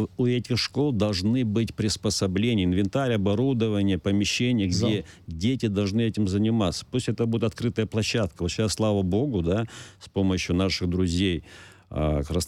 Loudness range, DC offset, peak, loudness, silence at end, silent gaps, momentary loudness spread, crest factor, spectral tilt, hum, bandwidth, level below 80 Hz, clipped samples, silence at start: 2 LU; under 0.1%; -12 dBFS; -25 LUFS; 0 s; none; 5 LU; 12 dB; -5.5 dB/octave; none; 14 kHz; -44 dBFS; under 0.1%; 0 s